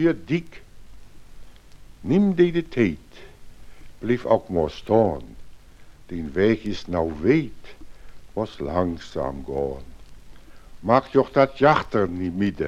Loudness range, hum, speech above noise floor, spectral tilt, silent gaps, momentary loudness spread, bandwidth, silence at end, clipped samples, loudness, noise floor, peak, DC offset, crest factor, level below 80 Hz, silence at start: 4 LU; none; 23 dB; -8 dB/octave; none; 15 LU; 10.5 kHz; 0 s; under 0.1%; -23 LUFS; -45 dBFS; -2 dBFS; under 0.1%; 22 dB; -44 dBFS; 0 s